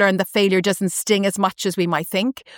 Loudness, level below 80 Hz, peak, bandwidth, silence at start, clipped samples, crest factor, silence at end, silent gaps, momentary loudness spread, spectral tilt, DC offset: -19 LUFS; -66 dBFS; -4 dBFS; 18.5 kHz; 0 s; under 0.1%; 16 dB; 0 s; none; 5 LU; -4 dB/octave; under 0.1%